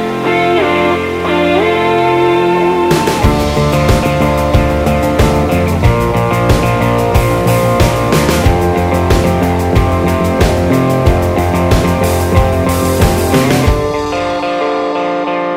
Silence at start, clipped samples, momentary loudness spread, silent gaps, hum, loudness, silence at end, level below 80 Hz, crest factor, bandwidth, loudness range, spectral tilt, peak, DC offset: 0 s; under 0.1%; 4 LU; none; none; -12 LUFS; 0 s; -20 dBFS; 10 dB; 16.5 kHz; 1 LU; -6 dB/octave; 0 dBFS; under 0.1%